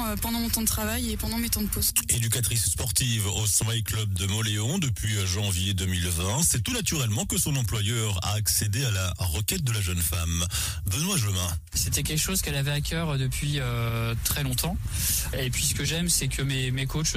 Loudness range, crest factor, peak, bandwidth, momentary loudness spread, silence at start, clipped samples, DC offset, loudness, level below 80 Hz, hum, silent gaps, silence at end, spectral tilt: 2 LU; 16 dB; -10 dBFS; 16 kHz; 5 LU; 0 s; under 0.1%; under 0.1%; -26 LUFS; -38 dBFS; none; none; 0 s; -3.5 dB/octave